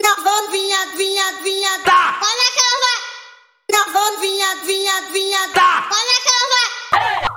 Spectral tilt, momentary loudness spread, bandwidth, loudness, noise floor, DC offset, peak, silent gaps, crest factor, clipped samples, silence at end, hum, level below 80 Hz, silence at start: 0.5 dB/octave; 5 LU; 17 kHz; -15 LUFS; -43 dBFS; under 0.1%; 0 dBFS; none; 16 dB; under 0.1%; 0 s; none; -54 dBFS; 0 s